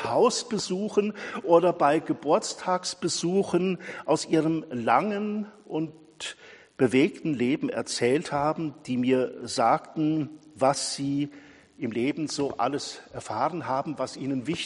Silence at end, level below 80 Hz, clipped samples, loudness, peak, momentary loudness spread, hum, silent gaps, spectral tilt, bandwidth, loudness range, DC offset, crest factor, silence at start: 0 s; -66 dBFS; under 0.1%; -27 LUFS; -8 dBFS; 11 LU; none; none; -5 dB/octave; 11 kHz; 4 LU; under 0.1%; 20 dB; 0 s